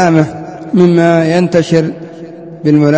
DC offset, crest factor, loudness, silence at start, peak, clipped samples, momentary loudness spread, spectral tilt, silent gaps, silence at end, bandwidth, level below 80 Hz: under 0.1%; 10 dB; -11 LUFS; 0 s; 0 dBFS; 0.4%; 20 LU; -7.5 dB/octave; none; 0 s; 8 kHz; -48 dBFS